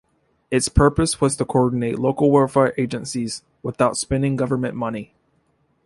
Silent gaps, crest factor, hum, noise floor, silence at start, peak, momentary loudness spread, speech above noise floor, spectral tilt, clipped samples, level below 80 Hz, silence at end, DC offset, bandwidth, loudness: none; 18 dB; none; -65 dBFS; 0.5 s; -2 dBFS; 11 LU; 45 dB; -5.5 dB/octave; under 0.1%; -36 dBFS; 0.8 s; under 0.1%; 11.5 kHz; -20 LUFS